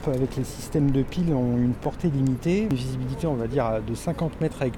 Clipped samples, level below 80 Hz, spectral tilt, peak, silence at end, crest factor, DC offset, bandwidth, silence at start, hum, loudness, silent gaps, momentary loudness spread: under 0.1%; -40 dBFS; -7.5 dB/octave; -12 dBFS; 0 s; 12 dB; under 0.1%; 17 kHz; 0 s; none; -26 LUFS; none; 5 LU